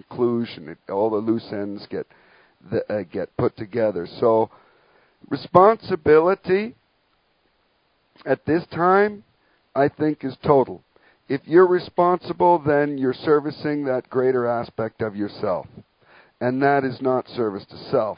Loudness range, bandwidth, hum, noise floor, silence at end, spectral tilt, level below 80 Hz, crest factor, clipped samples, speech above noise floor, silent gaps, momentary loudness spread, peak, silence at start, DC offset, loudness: 5 LU; 5.2 kHz; none; -66 dBFS; 0.05 s; -10.5 dB/octave; -56 dBFS; 22 dB; under 0.1%; 45 dB; none; 14 LU; 0 dBFS; 0.1 s; under 0.1%; -21 LUFS